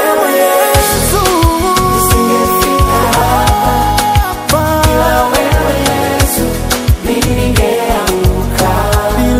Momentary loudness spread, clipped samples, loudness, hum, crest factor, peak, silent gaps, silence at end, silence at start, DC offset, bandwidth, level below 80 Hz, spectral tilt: 3 LU; 0.1%; -11 LUFS; none; 10 dB; 0 dBFS; none; 0 s; 0 s; under 0.1%; 16.5 kHz; -18 dBFS; -4.5 dB/octave